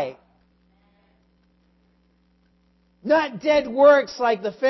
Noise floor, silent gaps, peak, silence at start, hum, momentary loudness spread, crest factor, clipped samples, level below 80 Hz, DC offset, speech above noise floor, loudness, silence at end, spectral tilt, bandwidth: -63 dBFS; none; -4 dBFS; 0 s; 60 Hz at -65 dBFS; 11 LU; 20 dB; under 0.1%; -62 dBFS; under 0.1%; 44 dB; -19 LUFS; 0 s; -5 dB/octave; 6 kHz